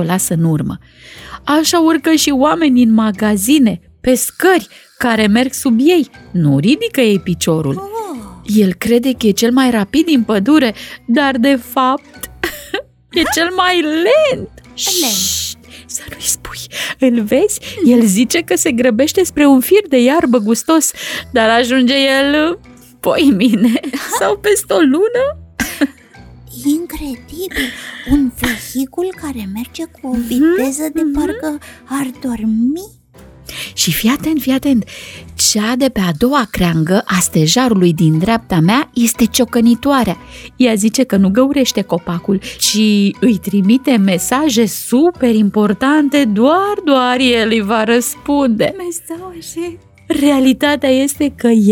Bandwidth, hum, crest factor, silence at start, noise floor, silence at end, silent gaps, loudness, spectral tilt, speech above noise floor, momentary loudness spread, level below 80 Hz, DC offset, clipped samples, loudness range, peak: 18.5 kHz; none; 12 dB; 0 s; -41 dBFS; 0 s; none; -13 LUFS; -4.5 dB/octave; 28 dB; 12 LU; -40 dBFS; under 0.1%; under 0.1%; 6 LU; 0 dBFS